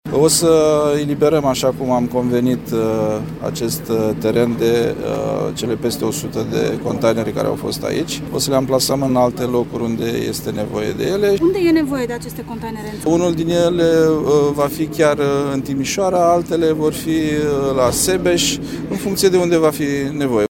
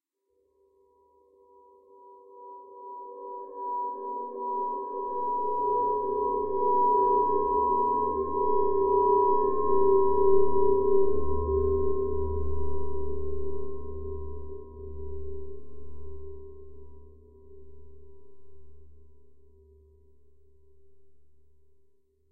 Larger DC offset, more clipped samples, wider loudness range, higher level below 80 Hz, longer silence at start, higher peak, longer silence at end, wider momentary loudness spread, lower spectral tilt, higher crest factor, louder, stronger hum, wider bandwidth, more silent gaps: neither; neither; second, 3 LU vs 20 LU; about the same, -42 dBFS vs -44 dBFS; about the same, 0.05 s vs 0 s; first, 0 dBFS vs -10 dBFS; about the same, 0.05 s vs 0 s; second, 8 LU vs 22 LU; second, -5 dB/octave vs -8 dB/octave; about the same, 16 dB vs 16 dB; first, -17 LUFS vs -27 LUFS; neither; first, 17 kHz vs 1.8 kHz; neither